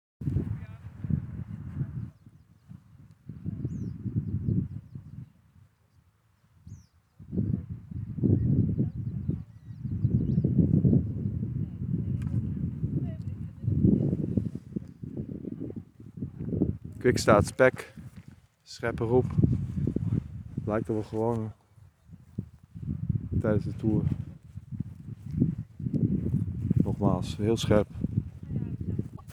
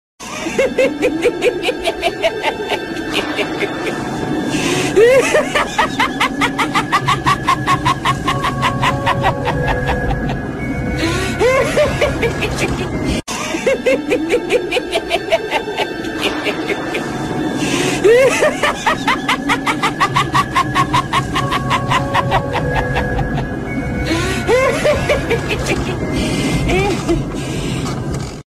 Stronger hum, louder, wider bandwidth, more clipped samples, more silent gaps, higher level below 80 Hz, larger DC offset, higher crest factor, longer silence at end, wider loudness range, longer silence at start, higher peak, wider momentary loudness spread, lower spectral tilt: neither; second, -30 LUFS vs -16 LUFS; second, 13 kHz vs 14.5 kHz; neither; neither; second, -46 dBFS vs -32 dBFS; neither; first, 24 dB vs 16 dB; about the same, 0 s vs 0.1 s; first, 10 LU vs 4 LU; about the same, 0.2 s vs 0.2 s; second, -6 dBFS vs 0 dBFS; first, 17 LU vs 7 LU; first, -8 dB/octave vs -4.5 dB/octave